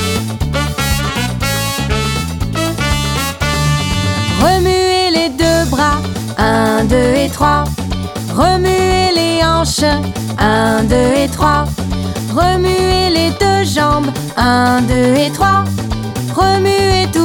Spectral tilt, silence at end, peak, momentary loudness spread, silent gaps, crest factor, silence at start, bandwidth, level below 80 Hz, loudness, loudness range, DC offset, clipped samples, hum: -5 dB/octave; 0 s; 0 dBFS; 7 LU; none; 12 dB; 0 s; over 20 kHz; -26 dBFS; -13 LUFS; 3 LU; under 0.1%; under 0.1%; none